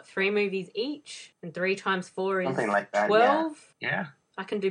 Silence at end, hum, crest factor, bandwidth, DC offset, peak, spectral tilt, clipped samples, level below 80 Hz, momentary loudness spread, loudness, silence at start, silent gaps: 0 s; none; 18 dB; 10.5 kHz; under 0.1%; -10 dBFS; -5 dB/octave; under 0.1%; -78 dBFS; 18 LU; -27 LUFS; 0.15 s; none